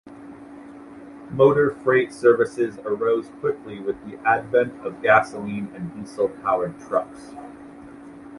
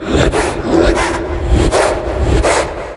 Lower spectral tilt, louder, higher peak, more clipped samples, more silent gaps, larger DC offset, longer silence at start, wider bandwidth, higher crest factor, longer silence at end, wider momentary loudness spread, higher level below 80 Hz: first, -7 dB/octave vs -5 dB/octave; second, -22 LUFS vs -14 LUFS; about the same, -2 dBFS vs 0 dBFS; neither; neither; neither; about the same, 0.05 s vs 0 s; about the same, 11.5 kHz vs 11.5 kHz; first, 20 dB vs 14 dB; about the same, 0 s vs 0 s; first, 24 LU vs 5 LU; second, -60 dBFS vs -18 dBFS